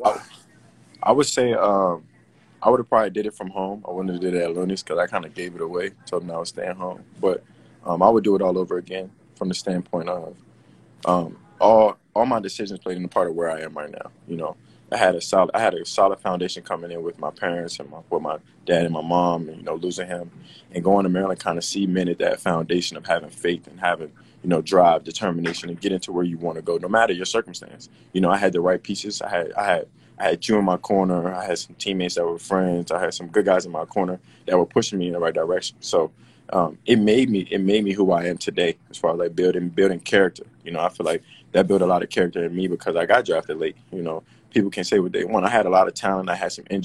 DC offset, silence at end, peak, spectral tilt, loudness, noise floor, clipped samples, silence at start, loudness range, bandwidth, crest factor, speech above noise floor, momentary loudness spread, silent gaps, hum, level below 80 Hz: under 0.1%; 0 s; 0 dBFS; -5 dB/octave; -22 LUFS; -55 dBFS; under 0.1%; 0 s; 4 LU; 12.5 kHz; 22 dB; 33 dB; 12 LU; none; none; -58 dBFS